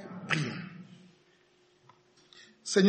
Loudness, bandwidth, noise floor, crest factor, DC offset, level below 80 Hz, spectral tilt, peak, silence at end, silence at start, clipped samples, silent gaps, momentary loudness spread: -34 LUFS; 8.8 kHz; -66 dBFS; 22 dB; under 0.1%; -78 dBFS; -5 dB/octave; -12 dBFS; 0 s; 0 s; under 0.1%; none; 25 LU